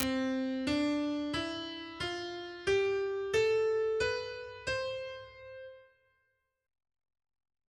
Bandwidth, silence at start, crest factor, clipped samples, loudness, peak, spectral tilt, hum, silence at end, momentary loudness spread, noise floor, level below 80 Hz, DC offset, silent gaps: 13.5 kHz; 0 s; 28 dB; under 0.1%; -33 LUFS; -8 dBFS; -4.5 dB/octave; none; 1.85 s; 15 LU; -79 dBFS; -60 dBFS; under 0.1%; none